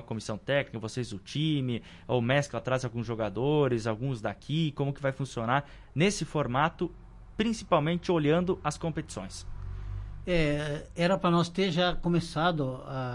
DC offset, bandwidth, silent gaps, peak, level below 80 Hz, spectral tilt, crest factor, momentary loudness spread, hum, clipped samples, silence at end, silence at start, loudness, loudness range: under 0.1%; 11.5 kHz; none; -10 dBFS; -46 dBFS; -6 dB/octave; 20 dB; 11 LU; none; under 0.1%; 0 s; 0 s; -30 LUFS; 2 LU